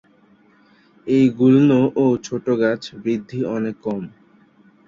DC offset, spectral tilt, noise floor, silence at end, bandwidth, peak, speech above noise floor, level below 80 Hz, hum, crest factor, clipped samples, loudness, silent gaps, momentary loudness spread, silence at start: under 0.1%; -7.5 dB/octave; -54 dBFS; 0.8 s; 7.4 kHz; -4 dBFS; 36 dB; -60 dBFS; none; 16 dB; under 0.1%; -19 LUFS; none; 13 LU; 1.05 s